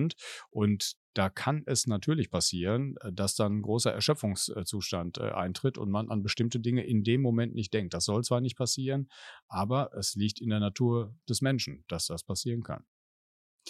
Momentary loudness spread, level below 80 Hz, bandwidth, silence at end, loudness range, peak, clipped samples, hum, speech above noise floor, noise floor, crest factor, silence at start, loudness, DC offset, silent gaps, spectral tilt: 6 LU; -62 dBFS; 13 kHz; 0 s; 2 LU; -10 dBFS; under 0.1%; none; over 59 dB; under -90 dBFS; 20 dB; 0 s; -31 LUFS; under 0.1%; 0.96-1.13 s, 9.42-9.49 s, 12.87-13.59 s; -5 dB/octave